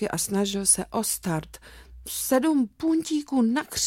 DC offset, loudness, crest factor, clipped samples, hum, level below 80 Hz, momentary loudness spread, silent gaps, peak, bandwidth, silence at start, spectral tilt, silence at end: under 0.1%; -24 LUFS; 16 dB; under 0.1%; none; -52 dBFS; 11 LU; none; -8 dBFS; 17 kHz; 0 s; -3.5 dB/octave; 0 s